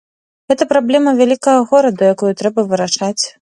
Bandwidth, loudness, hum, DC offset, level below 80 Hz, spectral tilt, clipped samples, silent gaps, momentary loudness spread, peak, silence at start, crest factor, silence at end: 11.5 kHz; -13 LUFS; none; under 0.1%; -62 dBFS; -4.5 dB/octave; under 0.1%; none; 6 LU; 0 dBFS; 0.5 s; 14 dB; 0.1 s